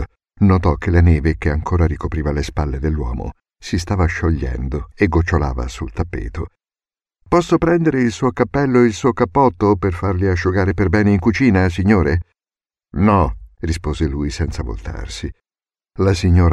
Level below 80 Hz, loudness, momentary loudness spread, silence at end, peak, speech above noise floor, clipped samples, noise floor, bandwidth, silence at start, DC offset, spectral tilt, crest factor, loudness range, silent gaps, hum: -28 dBFS; -17 LUFS; 13 LU; 0 s; -2 dBFS; over 74 dB; under 0.1%; under -90 dBFS; 10.5 kHz; 0 s; under 0.1%; -7.5 dB/octave; 16 dB; 5 LU; none; none